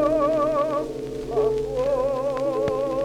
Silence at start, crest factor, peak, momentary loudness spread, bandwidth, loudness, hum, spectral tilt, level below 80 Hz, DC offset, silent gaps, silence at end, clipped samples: 0 s; 12 dB; -10 dBFS; 6 LU; 14.5 kHz; -24 LUFS; none; -6.5 dB/octave; -44 dBFS; under 0.1%; none; 0 s; under 0.1%